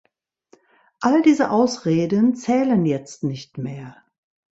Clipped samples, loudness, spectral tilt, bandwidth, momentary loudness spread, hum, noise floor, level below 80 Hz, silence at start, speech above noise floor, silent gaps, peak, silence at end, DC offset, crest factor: under 0.1%; -20 LUFS; -6.5 dB/octave; 8 kHz; 15 LU; none; -58 dBFS; -62 dBFS; 1 s; 39 dB; none; -4 dBFS; 0.6 s; under 0.1%; 16 dB